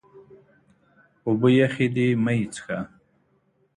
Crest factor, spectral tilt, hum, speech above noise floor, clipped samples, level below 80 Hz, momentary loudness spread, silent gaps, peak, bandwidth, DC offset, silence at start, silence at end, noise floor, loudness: 18 dB; -7 dB/octave; none; 43 dB; under 0.1%; -62 dBFS; 14 LU; none; -6 dBFS; 11 kHz; under 0.1%; 0.15 s; 0.9 s; -66 dBFS; -23 LUFS